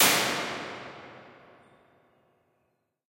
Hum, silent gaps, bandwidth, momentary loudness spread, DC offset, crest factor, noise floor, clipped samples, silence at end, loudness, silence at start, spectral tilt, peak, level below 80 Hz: none; none; 16.5 kHz; 25 LU; under 0.1%; 24 dB; -76 dBFS; under 0.1%; 1.75 s; -28 LUFS; 0 s; -1 dB/octave; -8 dBFS; -72 dBFS